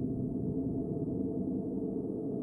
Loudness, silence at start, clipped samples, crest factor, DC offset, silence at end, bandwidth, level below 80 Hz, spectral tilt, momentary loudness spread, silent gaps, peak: -35 LUFS; 0 s; under 0.1%; 12 dB; under 0.1%; 0 s; 1.4 kHz; -54 dBFS; -13.5 dB/octave; 2 LU; none; -22 dBFS